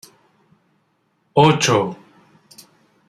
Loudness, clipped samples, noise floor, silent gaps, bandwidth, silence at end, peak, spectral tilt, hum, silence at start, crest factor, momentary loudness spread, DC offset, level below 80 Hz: -17 LUFS; under 0.1%; -66 dBFS; none; 14 kHz; 1.15 s; 0 dBFS; -4.5 dB/octave; none; 1.35 s; 20 dB; 15 LU; under 0.1%; -58 dBFS